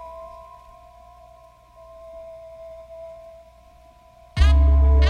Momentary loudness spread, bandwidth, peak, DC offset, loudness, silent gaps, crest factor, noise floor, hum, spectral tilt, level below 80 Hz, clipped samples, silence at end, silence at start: 28 LU; 6.8 kHz; -6 dBFS; under 0.1%; -18 LUFS; none; 18 dB; -50 dBFS; none; -7 dB/octave; -22 dBFS; under 0.1%; 0 s; 0 s